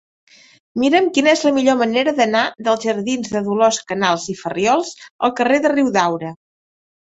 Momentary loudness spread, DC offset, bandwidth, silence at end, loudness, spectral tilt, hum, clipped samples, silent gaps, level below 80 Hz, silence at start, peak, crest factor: 7 LU; under 0.1%; 8.2 kHz; 0.8 s; -17 LUFS; -4 dB/octave; none; under 0.1%; 5.10-5.19 s; -60 dBFS; 0.75 s; -2 dBFS; 16 dB